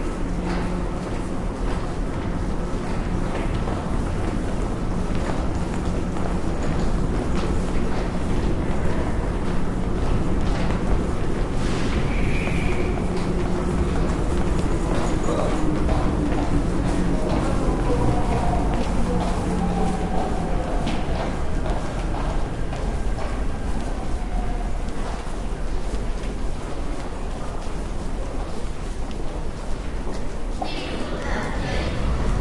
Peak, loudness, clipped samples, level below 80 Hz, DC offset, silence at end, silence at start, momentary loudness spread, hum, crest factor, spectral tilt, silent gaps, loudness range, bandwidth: -8 dBFS; -26 LUFS; under 0.1%; -26 dBFS; under 0.1%; 0 s; 0 s; 8 LU; none; 14 dB; -6.5 dB/octave; none; 7 LU; 11.5 kHz